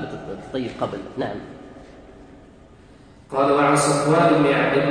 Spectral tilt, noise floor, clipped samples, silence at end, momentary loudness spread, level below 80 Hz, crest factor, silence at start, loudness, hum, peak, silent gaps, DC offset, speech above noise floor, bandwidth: -5 dB/octave; -47 dBFS; under 0.1%; 0 s; 17 LU; -52 dBFS; 16 dB; 0 s; -20 LUFS; none; -6 dBFS; none; under 0.1%; 28 dB; 10.5 kHz